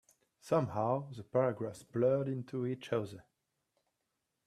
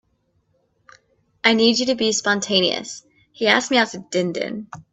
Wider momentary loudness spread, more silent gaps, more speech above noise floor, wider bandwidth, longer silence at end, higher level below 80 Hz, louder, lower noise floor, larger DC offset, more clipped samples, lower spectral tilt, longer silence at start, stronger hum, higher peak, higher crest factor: second, 9 LU vs 12 LU; neither; first, 50 dB vs 46 dB; first, 13 kHz vs 8.4 kHz; first, 1.25 s vs 0.1 s; second, -74 dBFS vs -64 dBFS; second, -35 LUFS vs -19 LUFS; first, -85 dBFS vs -66 dBFS; neither; neither; first, -8 dB/octave vs -3 dB/octave; second, 0.45 s vs 1.45 s; neither; second, -18 dBFS vs 0 dBFS; about the same, 20 dB vs 22 dB